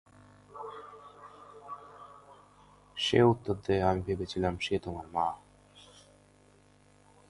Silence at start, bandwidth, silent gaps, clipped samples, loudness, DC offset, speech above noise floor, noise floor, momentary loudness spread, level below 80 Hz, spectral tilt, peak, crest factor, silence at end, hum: 0.55 s; 11.5 kHz; none; under 0.1%; -30 LUFS; under 0.1%; 32 dB; -62 dBFS; 26 LU; -54 dBFS; -6 dB/octave; -10 dBFS; 24 dB; 1.5 s; 50 Hz at -55 dBFS